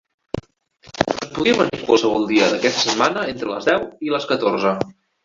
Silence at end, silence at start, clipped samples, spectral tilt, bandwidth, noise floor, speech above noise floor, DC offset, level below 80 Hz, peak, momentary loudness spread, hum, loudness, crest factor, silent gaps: 0.35 s; 0.35 s; under 0.1%; -4 dB/octave; 7.6 kHz; -50 dBFS; 32 dB; under 0.1%; -52 dBFS; -2 dBFS; 14 LU; none; -19 LUFS; 18 dB; none